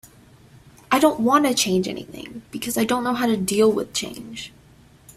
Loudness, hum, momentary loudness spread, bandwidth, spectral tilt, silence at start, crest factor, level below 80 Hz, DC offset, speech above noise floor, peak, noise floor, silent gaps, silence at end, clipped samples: -21 LUFS; none; 18 LU; 16 kHz; -4 dB/octave; 0.9 s; 20 dB; -56 dBFS; under 0.1%; 30 dB; -2 dBFS; -51 dBFS; none; 0.05 s; under 0.1%